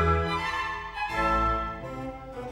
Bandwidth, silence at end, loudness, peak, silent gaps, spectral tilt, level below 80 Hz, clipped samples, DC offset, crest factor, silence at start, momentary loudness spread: 15 kHz; 0 s; -28 LUFS; -12 dBFS; none; -6 dB/octave; -38 dBFS; under 0.1%; under 0.1%; 16 dB; 0 s; 13 LU